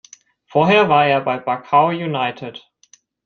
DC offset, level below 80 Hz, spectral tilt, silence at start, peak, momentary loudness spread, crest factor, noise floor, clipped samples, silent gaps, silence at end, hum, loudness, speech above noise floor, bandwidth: under 0.1%; -62 dBFS; -6 dB/octave; 0.55 s; -2 dBFS; 11 LU; 16 dB; -54 dBFS; under 0.1%; none; 0.65 s; none; -16 LUFS; 38 dB; 7 kHz